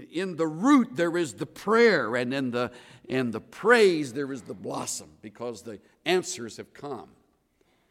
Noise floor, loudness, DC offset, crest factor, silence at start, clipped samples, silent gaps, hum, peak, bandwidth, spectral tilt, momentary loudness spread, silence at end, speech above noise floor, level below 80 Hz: -68 dBFS; -26 LUFS; under 0.1%; 20 dB; 0 s; under 0.1%; none; none; -6 dBFS; 15.5 kHz; -4.5 dB/octave; 19 LU; 0.85 s; 41 dB; -72 dBFS